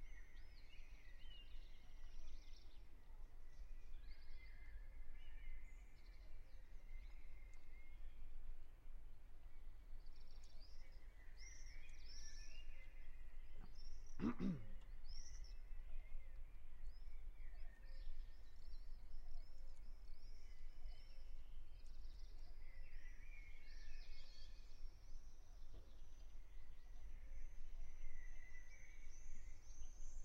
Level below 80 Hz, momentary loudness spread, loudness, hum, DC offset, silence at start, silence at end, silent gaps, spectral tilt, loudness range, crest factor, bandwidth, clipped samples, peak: -52 dBFS; 6 LU; -61 LUFS; none; under 0.1%; 0 s; 0 s; none; -5.5 dB/octave; 11 LU; 18 dB; 6.8 kHz; under 0.1%; -30 dBFS